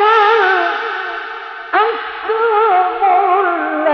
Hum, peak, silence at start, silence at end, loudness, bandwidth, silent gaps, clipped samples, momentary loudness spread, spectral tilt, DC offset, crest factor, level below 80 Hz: none; 0 dBFS; 0 s; 0 s; -14 LUFS; 6.4 kHz; none; under 0.1%; 12 LU; -2.5 dB/octave; under 0.1%; 14 dB; -62 dBFS